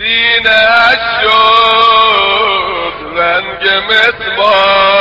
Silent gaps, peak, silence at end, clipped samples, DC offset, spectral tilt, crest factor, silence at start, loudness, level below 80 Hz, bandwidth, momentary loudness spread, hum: none; 0 dBFS; 0 s; 0.1%; under 0.1%; -3 dB/octave; 10 dB; 0 s; -8 LUFS; -40 dBFS; 8 kHz; 6 LU; none